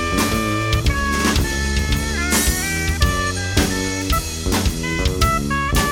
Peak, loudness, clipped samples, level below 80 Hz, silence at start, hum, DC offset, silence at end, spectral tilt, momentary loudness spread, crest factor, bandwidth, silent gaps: -2 dBFS; -19 LUFS; under 0.1%; -24 dBFS; 0 s; none; under 0.1%; 0 s; -4 dB/octave; 3 LU; 16 dB; 18 kHz; none